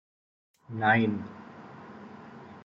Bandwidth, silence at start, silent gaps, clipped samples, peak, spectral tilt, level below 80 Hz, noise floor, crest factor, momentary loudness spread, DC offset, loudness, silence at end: 6 kHz; 0.7 s; none; under 0.1%; -10 dBFS; -8 dB/octave; -74 dBFS; -47 dBFS; 22 dB; 23 LU; under 0.1%; -26 LUFS; 0.05 s